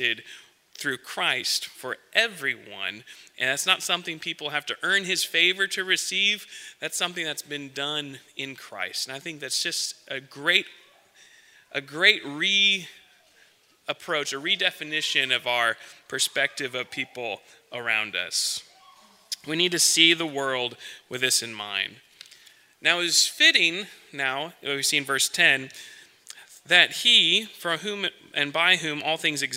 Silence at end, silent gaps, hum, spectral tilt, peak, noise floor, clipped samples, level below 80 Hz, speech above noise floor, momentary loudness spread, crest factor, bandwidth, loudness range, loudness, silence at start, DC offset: 0 s; none; none; -0.5 dB/octave; -2 dBFS; -60 dBFS; under 0.1%; -80 dBFS; 34 dB; 17 LU; 26 dB; 16 kHz; 7 LU; -23 LUFS; 0 s; under 0.1%